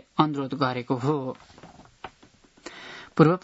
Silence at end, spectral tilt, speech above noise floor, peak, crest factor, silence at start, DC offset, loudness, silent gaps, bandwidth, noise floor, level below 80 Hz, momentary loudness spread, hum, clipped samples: 0.05 s; -7.5 dB/octave; 33 dB; -2 dBFS; 24 dB; 0.15 s; under 0.1%; -26 LUFS; none; 8 kHz; -57 dBFS; -64 dBFS; 23 LU; none; under 0.1%